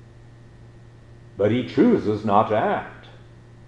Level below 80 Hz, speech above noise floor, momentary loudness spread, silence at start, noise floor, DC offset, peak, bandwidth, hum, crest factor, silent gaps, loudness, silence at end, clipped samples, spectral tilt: -54 dBFS; 26 dB; 12 LU; 0.75 s; -46 dBFS; under 0.1%; -4 dBFS; 8 kHz; none; 20 dB; none; -21 LUFS; 0.5 s; under 0.1%; -8.5 dB/octave